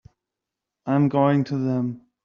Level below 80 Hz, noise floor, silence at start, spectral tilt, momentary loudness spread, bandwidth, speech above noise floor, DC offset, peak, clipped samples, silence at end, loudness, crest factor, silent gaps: -66 dBFS; -86 dBFS; 0.85 s; -8 dB/octave; 10 LU; 6.6 kHz; 65 dB; under 0.1%; -8 dBFS; under 0.1%; 0.25 s; -22 LUFS; 16 dB; none